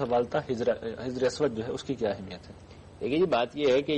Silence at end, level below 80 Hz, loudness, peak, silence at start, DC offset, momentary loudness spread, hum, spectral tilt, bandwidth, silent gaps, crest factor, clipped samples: 0 s; -58 dBFS; -29 LUFS; -16 dBFS; 0 s; under 0.1%; 15 LU; none; -5.5 dB/octave; 9.4 kHz; none; 12 dB; under 0.1%